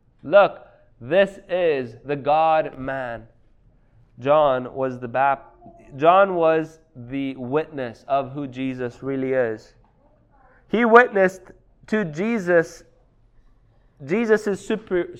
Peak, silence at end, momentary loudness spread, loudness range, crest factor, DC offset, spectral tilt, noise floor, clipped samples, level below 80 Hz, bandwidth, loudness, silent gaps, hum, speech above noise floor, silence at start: 0 dBFS; 0 s; 13 LU; 6 LU; 22 dB; under 0.1%; -6.5 dB/octave; -57 dBFS; under 0.1%; -56 dBFS; 10.5 kHz; -21 LUFS; none; none; 37 dB; 0.25 s